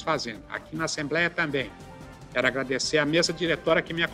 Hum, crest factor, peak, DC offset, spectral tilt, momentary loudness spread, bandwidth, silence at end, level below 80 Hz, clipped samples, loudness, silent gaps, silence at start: none; 18 dB; -8 dBFS; under 0.1%; -3.5 dB/octave; 13 LU; 15 kHz; 0 s; -54 dBFS; under 0.1%; -26 LUFS; none; 0 s